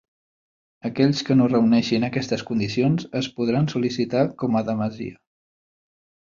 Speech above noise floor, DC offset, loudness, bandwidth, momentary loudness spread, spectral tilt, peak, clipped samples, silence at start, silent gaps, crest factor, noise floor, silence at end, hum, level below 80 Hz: over 69 dB; under 0.1%; -22 LUFS; 7.4 kHz; 10 LU; -6.5 dB/octave; -6 dBFS; under 0.1%; 0.85 s; none; 16 dB; under -90 dBFS; 1.25 s; none; -58 dBFS